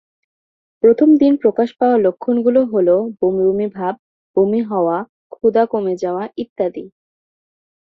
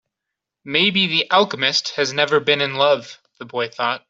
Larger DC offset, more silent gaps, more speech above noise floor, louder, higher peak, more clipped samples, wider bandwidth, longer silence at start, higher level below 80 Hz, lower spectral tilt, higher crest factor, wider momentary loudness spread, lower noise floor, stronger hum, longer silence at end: neither; first, 3.99-4.34 s, 5.09-5.30 s, 6.49-6.56 s vs none; first, over 75 dB vs 64 dB; about the same, -16 LUFS vs -18 LUFS; about the same, -2 dBFS vs -2 dBFS; neither; second, 6.4 kHz vs 7.8 kHz; first, 0.85 s vs 0.65 s; first, -60 dBFS vs -68 dBFS; first, -9 dB/octave vs -3 dB/octave; about the same, 14 dB vs 18 dB; about the same, 12 LU vs 10 LU; first, under -90 dBFS vs -83 dBFS; neither; first, 0.95 s vs 0.1 s